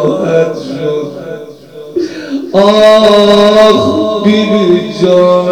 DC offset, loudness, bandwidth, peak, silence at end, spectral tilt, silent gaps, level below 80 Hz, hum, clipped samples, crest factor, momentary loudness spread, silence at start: under 0.1%; -8 LUFS; 14 kHz; 0 dBFS; 0 s; -6 dB/octave; none; -44 dBFS; none; 2%; 8 dB; 15 LU; 0 s